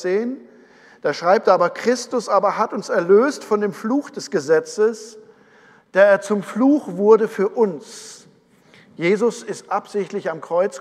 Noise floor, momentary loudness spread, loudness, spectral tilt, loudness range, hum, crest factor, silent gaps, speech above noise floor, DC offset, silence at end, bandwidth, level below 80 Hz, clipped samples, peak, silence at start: -53 dBFS; 12 LU; -19 LUFS; -5 dB/octave; 3 LU; none; 18 dB; none; 34 dB; under 0.1%; 0 s; 12.5 kHz; -78 dBFS; under 0.1%; 0 dBFS; 0 s